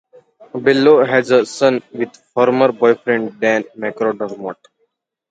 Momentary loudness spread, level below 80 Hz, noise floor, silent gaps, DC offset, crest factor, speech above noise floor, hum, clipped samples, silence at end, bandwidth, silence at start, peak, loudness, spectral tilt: 14 LU; -66 dBFS; -67 dBFS; none; under 0.1%; 16 dB; 52 dB; none; under 0.1%; 0.75 s; 9.2 kHz; 0.55 s; 0 dBFS; -15 LUFS; -5.5 dB/octave